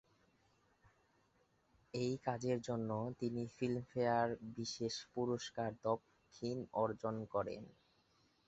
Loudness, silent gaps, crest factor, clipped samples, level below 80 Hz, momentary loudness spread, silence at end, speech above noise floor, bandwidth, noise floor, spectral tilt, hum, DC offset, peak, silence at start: -41 LUFS; none; 20 dB; under 0.1%; -74 dBFS; 7 LU; 0.75 s; 36 dB; 8 kHz; -76 dBFS; -5.5 dB/octave; none; under 0.1%; -22 dBFS; 1.95 s